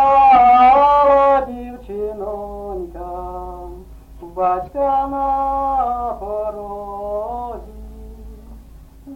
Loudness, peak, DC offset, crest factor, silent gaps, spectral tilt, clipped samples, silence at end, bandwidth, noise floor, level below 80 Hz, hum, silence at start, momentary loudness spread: -16 LUFS; -4 dBFS; under 0.1%; 14 dB; none; -7 dB/octave; under 0.1%; 0 s; 6 kHz; -40 dBFS; -38 dBFS; none; 0 s; 22 LU